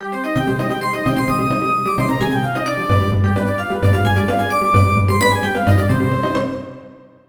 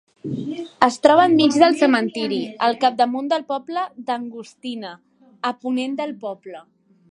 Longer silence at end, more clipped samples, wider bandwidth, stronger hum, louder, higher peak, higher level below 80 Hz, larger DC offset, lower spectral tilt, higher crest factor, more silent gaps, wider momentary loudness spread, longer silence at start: second, 0.3 s vs 0.5 s; neither; first, over 20 kHz vs 11 kHz; neither; about the same, -17 LUFS vs -19 LUFS; about the same, 0 dBFS vs 0 dBFS; first, -40 dBFS vs -66 dBFS; neither; first, -6.5 dB/octave vs -4.5 dB/octave; about the same, 16 dB vs 20 dB; neither; second, 5 LU vs 18 LU; second, 0 s vs 0.25 s